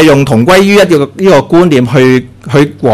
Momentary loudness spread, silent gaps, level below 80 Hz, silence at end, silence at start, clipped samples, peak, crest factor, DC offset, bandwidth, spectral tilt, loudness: 5 LU; none; -36 dBFS; 0 s; 0 s; 3%; 0 dBFS; 6 dB; under 0.1%; 15.5 kHz; -6 dB/octave; -7 LUFS